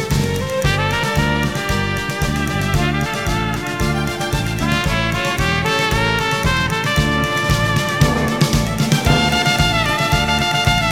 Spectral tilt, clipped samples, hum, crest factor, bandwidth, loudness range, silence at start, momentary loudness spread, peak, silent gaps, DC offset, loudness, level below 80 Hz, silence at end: -4.5 dB/octave; under 0.1%; none; 16 dB; 17 kHz; 3 LU; 0 s; 5 LU; 0 dBFS; none; 0.5%; -17 LUFS; -28 dBFS; 0 s